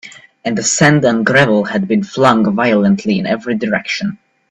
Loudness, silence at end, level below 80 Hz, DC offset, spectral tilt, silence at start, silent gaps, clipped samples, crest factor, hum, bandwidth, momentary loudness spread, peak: -13 LUFS; 0.35 s; -52 dBFS; under 0.1%; -4.5 dB/octave; 0.05 s; none; under 0.1%; 14 dB; none; 9.2 kHz; 9 LU; 0 dBFS